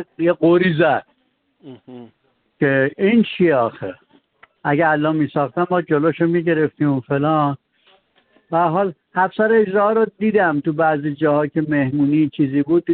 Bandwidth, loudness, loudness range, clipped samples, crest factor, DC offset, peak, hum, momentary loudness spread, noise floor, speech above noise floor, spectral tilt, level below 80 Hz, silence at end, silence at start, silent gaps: 4.4 kHz; -18 LUFS; 3 LU; under 0.1%; 14 dB; under 0.1%; -4 dBFS; none; 7 LU; -65 dBFS; 48 dB; -6 dB/octave; -60 dBFS; 0 s; 0 s; none